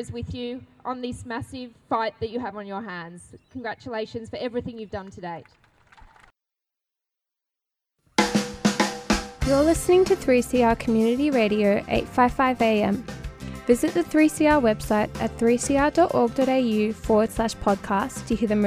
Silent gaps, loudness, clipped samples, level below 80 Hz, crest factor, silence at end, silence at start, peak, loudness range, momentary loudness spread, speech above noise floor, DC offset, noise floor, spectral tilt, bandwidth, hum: none; -23 LUFS; under 0.1%; -42 dBFS; 18 dB; 0 s; 0 s; -6 dBFS; 13 LU; 16 LU; 64 dB; under 0.1%; -87 dBFS; -5 dB/octave; 16 kHz; none